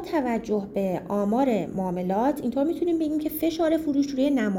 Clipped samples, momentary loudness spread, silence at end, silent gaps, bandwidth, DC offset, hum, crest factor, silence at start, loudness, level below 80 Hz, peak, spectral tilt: under 0.1%; 5 LU; 0 s; none; 17 kHz; under 0.1%; none; 12 dB; 0 s; -25 LUFS; -54 dBFS; -12 dBFS; -7 dB/octave